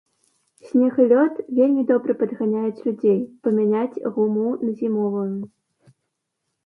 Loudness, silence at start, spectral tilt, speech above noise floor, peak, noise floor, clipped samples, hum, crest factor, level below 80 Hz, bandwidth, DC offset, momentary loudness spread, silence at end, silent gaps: -21 LUFS; 0.65 s; -10 dB/octave; 58 dB; -4 dBFS; -78 dBFS; under 0.1%; none; 16 dB; -72 dBFS; 4.6 kHz; under 0.1%; 8 LU; 1.2 s; none